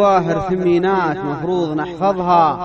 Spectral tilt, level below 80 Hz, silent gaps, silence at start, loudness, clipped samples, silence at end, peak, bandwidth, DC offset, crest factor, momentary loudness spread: -7.5 dB/octave; -46 dBFS; none; 0 s; -17 LUFS; under 0.1%; 0 s; -2 dBFS; 7 kHz; under 0.1%; 14 dB; 6 LU